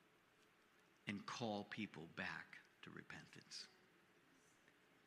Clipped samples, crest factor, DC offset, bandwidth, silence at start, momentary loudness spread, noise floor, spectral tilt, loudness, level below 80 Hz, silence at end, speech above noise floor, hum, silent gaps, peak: under 0.1%; 24 dB; under 0.1%; 14 kHz; 0 s; 12 LU; -75 dBFS; -4 dB/octave; -52 LUFS; -90 dBFS; 0 s; 23 dB; none; none; -30 dBFS